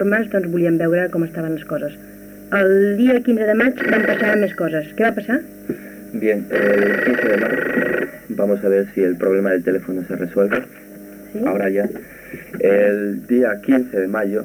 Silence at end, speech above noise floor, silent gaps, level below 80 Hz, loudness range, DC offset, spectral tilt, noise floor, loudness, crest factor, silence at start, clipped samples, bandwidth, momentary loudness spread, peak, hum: 0 s; 20 dB; none; -56 dBFS; 3 LU; under 0.1%; -7 dB/octave; -37 dBFS; -18 LUFS; 12 dB; 0 s; under 0.1%; 19 kHz; 14 LU; -6 dBFS; none